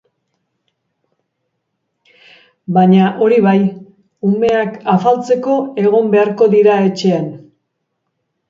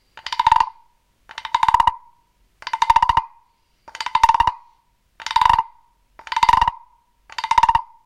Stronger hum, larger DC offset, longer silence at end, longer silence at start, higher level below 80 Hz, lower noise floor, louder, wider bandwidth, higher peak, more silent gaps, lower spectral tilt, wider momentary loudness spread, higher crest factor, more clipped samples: neither; neither; first, 1.1 s vs 0.2 s; first, 2.7 s vs 0.15 s; second, -60 dBFS vs -42 dBFS; first, -71 dBFS vs -61 dBFS; first, -13 LUFS vs -18 LUFS; second, 7.6 kHz vs 14.5 kHz; about the same, 0 dBFS vs 0 dBFS; neither; first, -8 dB/octave vs -1.5 dB/octave; second, 8 LU vs 17 LU; second, 14 dB vs 20 dB; neither